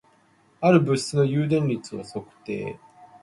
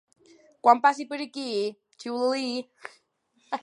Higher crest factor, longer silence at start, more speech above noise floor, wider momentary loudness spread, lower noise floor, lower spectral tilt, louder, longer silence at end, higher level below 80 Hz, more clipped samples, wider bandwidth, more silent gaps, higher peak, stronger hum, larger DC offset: about the same, 20 dB vs 22 dB; about the same, 0.6 s vs 0.65 s; second, 37 dB vs 43 dB; second, 17 LU vs 22 LU; second, -60 dBFS vs -69 dBFS; first, -6.5 dB/octave vs -3.5 dB/octave; first, -23 LUFS vs -26 LUFS; first, 0.15 s vs 0 s; first, -62 dBFS vs -86 dBFS; neither; about the same, 11.5 kHz vs 11 kHz; neither; about the same, -4 dBFS vs -4 dBFS; neither; neither